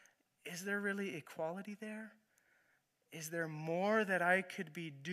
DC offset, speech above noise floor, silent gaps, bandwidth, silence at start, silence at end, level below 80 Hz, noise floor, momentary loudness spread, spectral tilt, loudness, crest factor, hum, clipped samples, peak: under 0.1%; 39 dB; none; 15 kHz; 0.45 s; 0 s; under -90 dBFS; -78 dBFS; 16 LU; -5 dB/octave; -39 LUFS; 20 dB; none; under 0.1%; -20 dBFS